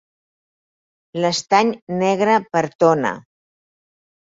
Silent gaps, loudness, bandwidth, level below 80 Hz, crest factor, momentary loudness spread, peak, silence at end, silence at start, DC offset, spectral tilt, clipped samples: 1.82-1.87 s, 2.75-2.79 s; -18 LUFS; 7.8 kHz; -66 dBFS; 20 dB; 8 LU; -2 dBFS; 1.1 s; 1.15 s; under 0.1%; -5 dB/octave; under 0.1%